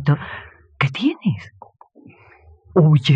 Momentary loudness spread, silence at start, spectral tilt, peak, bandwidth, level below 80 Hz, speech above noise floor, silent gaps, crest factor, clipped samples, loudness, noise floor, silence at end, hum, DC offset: 19 LU; 0 s; -8 dB/octave; -4 dBFS; 7.4 kHz; -56 dBFS; 32 dB; none; 16 dB; under 0.1%; -19 LUFS; -49 dBFS; 0 s; none; under 0.1%